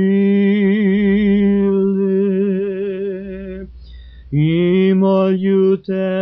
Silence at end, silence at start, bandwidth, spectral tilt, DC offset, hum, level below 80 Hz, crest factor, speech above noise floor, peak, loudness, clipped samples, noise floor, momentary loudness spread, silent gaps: 0 s; 0 s; 4.8 kHz; -8 dB/octave; under 0.1%; none; -42 dBFS; 10 dB; 22 dB; -6 dBFS; -15 LUFS; under 0.1%; -36 dBFS; 12 LU; none